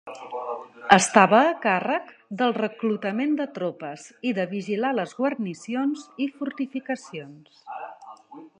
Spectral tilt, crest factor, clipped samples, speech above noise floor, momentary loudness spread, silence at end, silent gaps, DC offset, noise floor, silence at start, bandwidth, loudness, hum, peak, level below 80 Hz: -4.5 dB/octave; 24 dB; under 0.1%; 21 dB; 20 LU; 0.15 s; none; under 0.1%; -45 dBFS; 0.05 s; 11 kHz; -24 LUFS; none; 0 dBFS; -70 dBFS